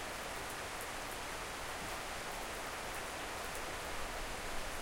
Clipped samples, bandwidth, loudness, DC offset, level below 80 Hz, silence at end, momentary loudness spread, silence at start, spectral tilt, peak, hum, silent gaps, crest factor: under 0.1%; 17 kHz; -42 LUFS; under 0.1%; -52 dBFS; 0 s; 1 LU; 0 s; -2 dB/octave; -28 dBFS; none; none; 14 dB